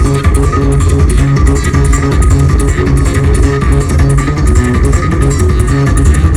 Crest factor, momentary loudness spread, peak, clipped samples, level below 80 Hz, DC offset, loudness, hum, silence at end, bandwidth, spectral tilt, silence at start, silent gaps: 8 dB; 1 LU; 0 dBFS; 0.4%; -12 dBFS; 2%; -10 LUFS; none; 0 s; 13 kHz; -6.5 dB/octave; 0 s; none